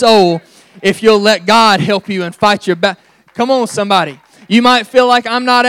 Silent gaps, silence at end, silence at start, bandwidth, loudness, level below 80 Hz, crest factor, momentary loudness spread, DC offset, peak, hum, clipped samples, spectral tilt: none; 0 s; 0 s; 17.5 kHz; -11 LUFS; -54 dBFS; 12 dB; 10 LU; under 0.1%; 0 dBFS; none; 0.7%; -4.5 dB/octave